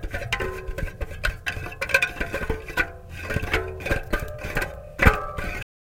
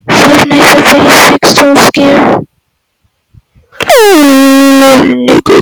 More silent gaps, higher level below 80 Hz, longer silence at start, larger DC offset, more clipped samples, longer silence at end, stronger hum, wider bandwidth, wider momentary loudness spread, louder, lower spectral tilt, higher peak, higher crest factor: neither; first, -32 dBFS vs -38 dBFS; about the same, 0 s vs 0.05 s; neither; second, under 0.1% vs 2%; first, 0.35 s vs 0 s; neither; second, 17 kHz vs over 20 kHz; first, 12 LU vs 4 LU; second, -26 LUFS vs -3 LUFS; first, -5 dB/octave vs -3.5 dB/octave; about the same, 0 dBFS vs 0 dBFS; first, 26 dB vs 4 dB